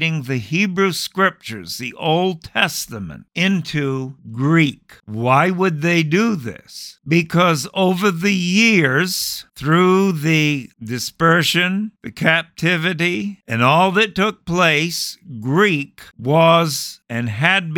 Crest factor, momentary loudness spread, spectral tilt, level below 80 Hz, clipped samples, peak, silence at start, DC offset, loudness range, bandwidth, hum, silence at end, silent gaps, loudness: 16 dB; 13 LU; -5 dB/octave; -54 dBFS; under 0.1%; 0 dBFS; 0 s; under 0.1%; 4 LU; 19 kHz; none; 0 s; none; -17 LUFS